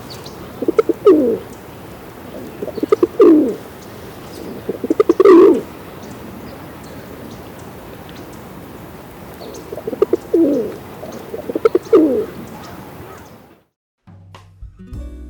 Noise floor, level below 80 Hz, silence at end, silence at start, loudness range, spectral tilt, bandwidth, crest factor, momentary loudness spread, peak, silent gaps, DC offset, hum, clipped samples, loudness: -43 dBFS; -44 dBFS; 0 s; 0 s; 19 LU; -7 dB/octave; over 20 kHz; 16 dB; 23 LU; -2 dBFS; 13.76-13.98 s; under 0.1%; none; under 0.1%; -14 LUFS